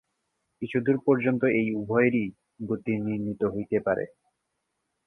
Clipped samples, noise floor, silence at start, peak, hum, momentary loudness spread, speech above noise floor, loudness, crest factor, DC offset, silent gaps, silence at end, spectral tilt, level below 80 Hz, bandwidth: under 0.1%; -80 dBFS; 0.6 s; -10 dBFS; none; 11 LU; 54 dB; -26 LUFS; 18 dB; under 0.1%; none; 1 s; -10 dB/octave; -62 dBFS; 3.8 kHz